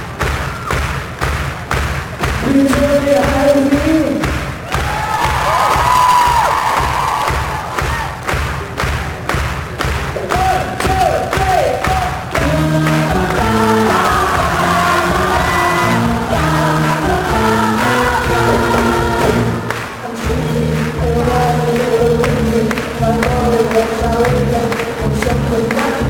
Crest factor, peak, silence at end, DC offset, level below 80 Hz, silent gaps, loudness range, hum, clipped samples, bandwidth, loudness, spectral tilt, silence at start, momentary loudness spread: 14 dB; 0 dBFS; 0 s; under 0.1%; -26 dBFS; none; 3 LU; none; under 0.1%; 19 kHz; -14 LUFS; -5.5 dB/octave; 0 s; 7 LU